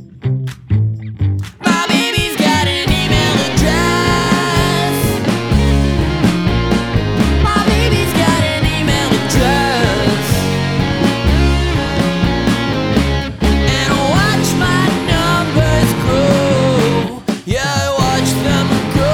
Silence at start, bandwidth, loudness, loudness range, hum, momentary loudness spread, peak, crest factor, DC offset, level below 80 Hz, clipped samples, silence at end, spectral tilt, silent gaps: 0 s; 19.5 kHz; -14 LUFS; 1 LU; none; 4 LU; 0 dBFS; 14 dB; under 0.1%; -22 dBFS; under 0.1%; 0 s; -5 dB/octave; none